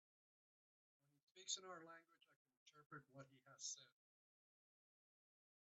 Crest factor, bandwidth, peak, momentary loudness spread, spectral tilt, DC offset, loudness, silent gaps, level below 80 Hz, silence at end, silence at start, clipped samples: 30 dB; 7.6 kHz; -32 dBFS; 16 LU; -1 dB/octave; under 0.1%; -54 LUFS; 2.36-2.45 s, 2.57-2.66 s, 2.86-2.90 s; under -90 dBFS; 1.75 s; 1.35 s; under 0.1%